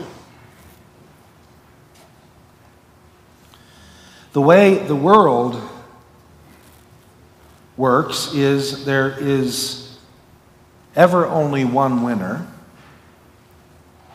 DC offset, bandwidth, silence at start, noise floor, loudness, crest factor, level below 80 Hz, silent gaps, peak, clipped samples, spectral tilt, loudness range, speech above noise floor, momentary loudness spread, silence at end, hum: under 0.1%; 16 kHz; 0 s; -50 dBFS; -16 LUFS; 20 dB; -58 dBFS; none; 0 dBFS; under 0.1%; -5.5 dB/octave; 5 LU; 34 dB; 19 LU; 1.65 s; none